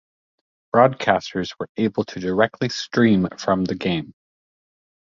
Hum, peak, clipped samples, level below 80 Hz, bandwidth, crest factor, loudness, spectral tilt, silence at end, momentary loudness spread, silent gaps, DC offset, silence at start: none; -2 dBFS; under 0.1%; -54 dBFS; 7.6 kHz; 20 dB; -21 LUFS; -6 dB/octave; 0.95 s; 10 LU; 1.69-1.75 s; under 0.1%; 0.75 s